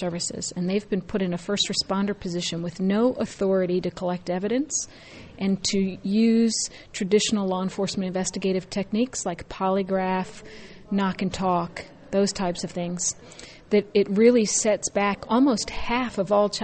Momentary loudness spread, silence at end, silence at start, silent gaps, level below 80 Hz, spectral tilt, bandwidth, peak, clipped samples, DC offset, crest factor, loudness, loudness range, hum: 9 LU; 0 s; 0 s; none; -52 dBFS; -4.5 dB/octave; 8.8 kHz; -6 dBFS; under 0.1%; under 0.1%; 20 dB; -25 LUFS; 4 LU; none